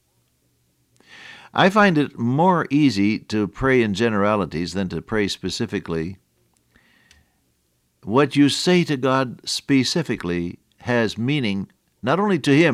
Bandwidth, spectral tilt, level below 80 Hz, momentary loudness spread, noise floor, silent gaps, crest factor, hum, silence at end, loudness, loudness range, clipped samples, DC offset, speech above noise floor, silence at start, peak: 13.5 kHz; -5.5 dB/octave; -50 dBFS; 11 LU; -67 dBFS; none; 18 dB; none; 0 s; -20 LUFS; 8 LU; under 0.1%; under 0.1%; 47 dB; 1.15 s; -4 dBFS